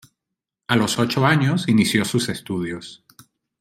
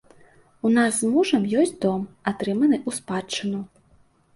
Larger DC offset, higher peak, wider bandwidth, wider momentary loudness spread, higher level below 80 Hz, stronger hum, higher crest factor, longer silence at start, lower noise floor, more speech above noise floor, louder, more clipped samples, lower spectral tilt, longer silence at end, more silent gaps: neither; first, -2 dBFS vs -6 dBFS; first, 16 kHz vs 11.5 kHz; first, 15 LU vs 9 LU; about the same, -58 dBFS vs -62 dBFS; neither; about the same, 20 dB vs 18 dB; about the same, 0.7 s vs 0.65 s; first, -84 dBFS vs -59 dBFS; first, 64 dB vs 36 dB; first, -20 LUFS vs -23 LUFS; neither; about the same, -5 dB/octave vs -4.5 dB/octave; about the same, 0.65 s vs 0.7 s; neither